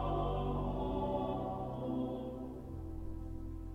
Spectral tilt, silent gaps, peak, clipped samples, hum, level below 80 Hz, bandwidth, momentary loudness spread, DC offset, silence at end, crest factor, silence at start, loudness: -9.5 dB/octave; none; -24 dBFS; under 0.1%; none; -46 dBFS; 6.2 kHz; 10 LU; under 0.1%; 0 s; 14 dB; 0 s; -40 LUFS